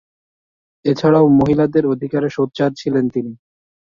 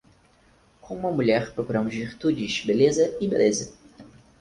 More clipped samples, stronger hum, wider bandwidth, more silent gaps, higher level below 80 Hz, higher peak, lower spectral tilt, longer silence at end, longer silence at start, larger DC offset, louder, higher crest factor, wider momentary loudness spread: neither; neither; second, 7.2 kHz vs 11 kHz; neither; first, -48 dBFS vs -56 dBFS; first, -2 dBFS vs -8 dBFS; first, -8 dB/octave vs -5 dB/octave; first, 0.6 s vs 0.35 s; about the same, 0.85 s vs 0.85 s; neither; first, -16 LUFS vs -24 LUFS; about the same, 16 dB vs 18 dB; about the same, 10 LU vs 10 LU